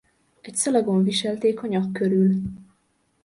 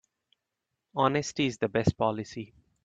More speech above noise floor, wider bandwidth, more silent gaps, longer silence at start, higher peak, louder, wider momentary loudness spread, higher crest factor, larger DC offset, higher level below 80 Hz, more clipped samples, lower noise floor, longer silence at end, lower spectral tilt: second, 46 dB vs 57 dB; first, 11.5 kHz vs 9 kHz; neither; second, 0.45 s vs 0.95 s; about the same, -8 dBFS vs -10 dBFS; first, -22 LUFS vs -29 LUFS; second, 7 LU vs 14 LU; second, 16 dB vs 22 dB; neither; about the same, -56 dBFS vs -56 dBFS; neither; second, -68 dBFS vs -85 dBFS; first, 0.6 s vs 0.4 s; about the same, -5.5 dB/octave vs -5.5 dB/octave